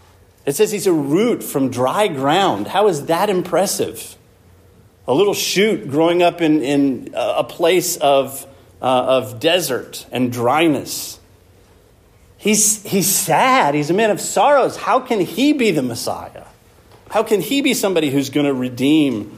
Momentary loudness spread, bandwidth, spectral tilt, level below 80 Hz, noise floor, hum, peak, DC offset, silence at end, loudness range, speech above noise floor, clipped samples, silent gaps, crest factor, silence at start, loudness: 10 LU; 15.5 kHz; -3.5 dB/octave; -58 dBFS; -50 dBFS; none; -2 dBFS; under 0.1%; 0 s; 4 LU; 33 dB; under 0.1%; none; 16 dB; 0.45 s; -17 LUFS